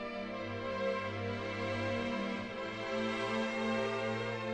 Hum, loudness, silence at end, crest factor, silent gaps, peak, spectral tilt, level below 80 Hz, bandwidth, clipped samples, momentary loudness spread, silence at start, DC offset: none; -37 LUFS; 0 s; 14 dB; none; -22 dBFS; -5.5 dB/octave; -64 dBFS; 10 kHz; under 0.1%; 5 LU; 0 s; under 0.1%